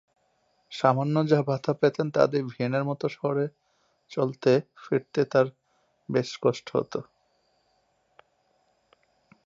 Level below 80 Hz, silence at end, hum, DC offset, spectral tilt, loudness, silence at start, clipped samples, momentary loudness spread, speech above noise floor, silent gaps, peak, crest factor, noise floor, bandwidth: -74 dBFS; 2.45 s; none; under 0.1%; -7 dB/octave; -26 LUFS; 0.7 s; under 0.1%; 7 LU; 45 dB; none; -4 dBFS; 22 dB; -70 dBFS; 7.8 kHz